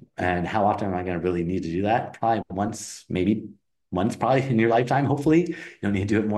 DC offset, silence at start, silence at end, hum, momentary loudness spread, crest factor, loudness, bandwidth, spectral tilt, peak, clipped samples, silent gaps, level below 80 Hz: under 0.1%; 0.2 s; 0 s; none; 9 LU; 16 dB; -24 LUFS; 12.5 kHz; -7 dB/octave; -8 dBFS; under 0.1%; none; -54 dBFS